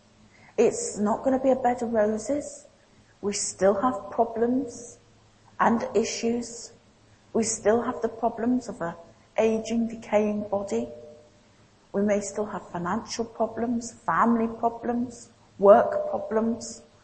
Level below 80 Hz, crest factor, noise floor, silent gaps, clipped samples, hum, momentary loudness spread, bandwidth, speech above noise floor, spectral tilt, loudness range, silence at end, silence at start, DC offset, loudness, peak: -60 dBFS; 24 dB; -58 dBFS; none; under 0.1%; none; 12 LU; 8.8 kHz; 33 dB; -4.5 dB/octave; 5 LU; 0.25 s; 0.6 s; under 0.1%; -26 LUFS; -2 dBFS